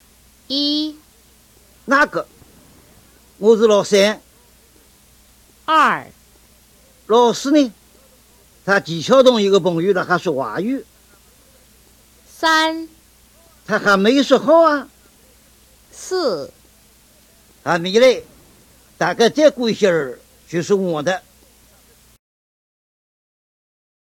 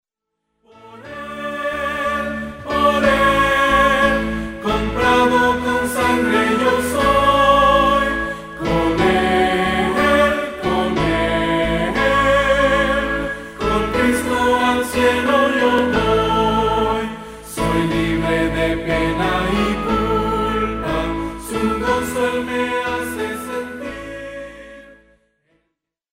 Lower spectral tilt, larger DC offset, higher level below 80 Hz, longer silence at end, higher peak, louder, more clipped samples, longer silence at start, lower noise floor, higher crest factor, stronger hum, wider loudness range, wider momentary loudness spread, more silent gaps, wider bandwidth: about the same, -4.5 dB/octave vs -5 dB/octave; neither; second, -56 dBFS vs -34 dBFS; first, 2.95 s vs 1.2 s; about the same, 0 dBFS vs -2 dBFS; about the same, -16 LUFS vs -17 LUFS; neither; second, 0.5 s vs 0.85 s; second, -51 dBFS vs -77 dBFS; about the same, 20 dB vs 16 dB; first, 60 Hz at -55 dBFS vs none; about the same, 6 LU vs 6 LU; first, 15 LU vs 11 LU; neither; about the same, 17 kHz vs 16 kHz